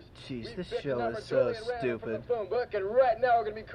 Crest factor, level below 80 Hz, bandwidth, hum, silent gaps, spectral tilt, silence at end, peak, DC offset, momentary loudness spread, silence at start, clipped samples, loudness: 16 dB; -58 dBFS; 10 kHz; none; none; -6.5 dB/octave; 0 s; -14 dBFS; under 0.1%; 12 LU; 0 s; under 0.1%; -30 LUFS